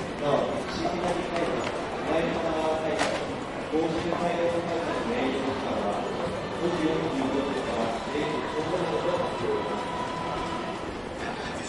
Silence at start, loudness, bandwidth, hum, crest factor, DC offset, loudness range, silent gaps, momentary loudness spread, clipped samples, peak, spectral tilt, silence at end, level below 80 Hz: 0 s; -29 LUFS; 11.5 kHz; none; 18 dB; under 0.1%; 1 LU; none; 5 LU; under 0.1%; -12 dBFS; -5 dB/octave; 0 s; -50 dBFS